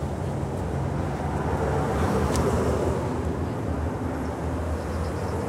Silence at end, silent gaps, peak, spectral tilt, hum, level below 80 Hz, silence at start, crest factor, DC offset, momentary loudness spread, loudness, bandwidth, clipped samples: 0 s; none; -10 dBFS; -7 dB/octave; none; -34 dBFS; 0 s; 16 dB; under 0.1%; 6 LU; -27 LUFS; 15.5 kHz; under 0.1%